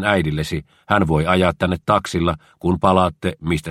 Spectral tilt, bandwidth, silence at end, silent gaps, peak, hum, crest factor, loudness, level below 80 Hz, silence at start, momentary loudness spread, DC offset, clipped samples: -6.5 dB/octave; 15 kHz; 0 s; none; 0 dBFS; none; 18 dB; -19 LUFS; -38 dBFS; 0 s; 8 LU; under 0.1%; under 0.1%